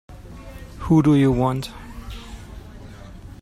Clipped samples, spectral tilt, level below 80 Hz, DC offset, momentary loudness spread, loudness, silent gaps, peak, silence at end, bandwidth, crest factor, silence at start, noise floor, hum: under 0.1%; -8 dB/octave; -40 dBFS; under 0.1%; 25 LU; -18 LUFS; none; -4 dBFS; 0.05 s; 14 kHz; 18 dB; 0.1 s; -39 dBFS; none